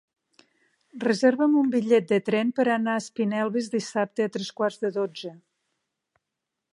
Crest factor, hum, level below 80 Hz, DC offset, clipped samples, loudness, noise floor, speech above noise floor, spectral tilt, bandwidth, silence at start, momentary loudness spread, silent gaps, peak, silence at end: 18 dB; none; -78 dBFS; under 0.1%; under 0.1%; -25 LUFS; -84 dBFS; 60 dB; -5.5 dB/octave; 11.5 kHz; 0.95 s; 8 LU; none; -8 dBFS; 1.4 s